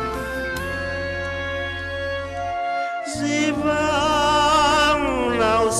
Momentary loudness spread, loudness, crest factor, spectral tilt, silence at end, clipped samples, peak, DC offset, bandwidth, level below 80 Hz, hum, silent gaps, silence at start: 10 LU; -21 LUFS; 12 dB; -3.5 dB/octave; 0 s; under 0.1%; -8 dBFS; under 0.1%; 13 kHz; -40 dBFS; none; none; 0 s